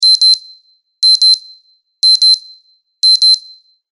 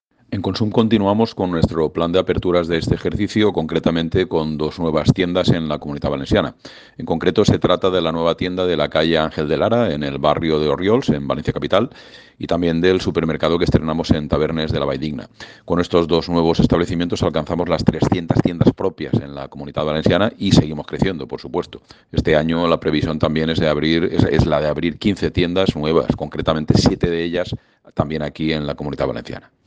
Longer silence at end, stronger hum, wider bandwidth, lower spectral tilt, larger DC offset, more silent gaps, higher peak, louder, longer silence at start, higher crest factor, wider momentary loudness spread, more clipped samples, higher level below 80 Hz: first, 0.55 s vs 0.25 s; neither; first, 11 kHz vs 9.4 kHz; second, 6 dB/octave vs -7 dB/octave; neither; neither; about the same, 0 dBFS vs 0 dBFS; first, -8 LUFS vs -18 LUFS; second, 0 s vs 0.3 s; second, 12 dB vs 18 dB; about the same, 7 LU vs 9 LU; neither; second, -78 dBFS vs -38 dBFS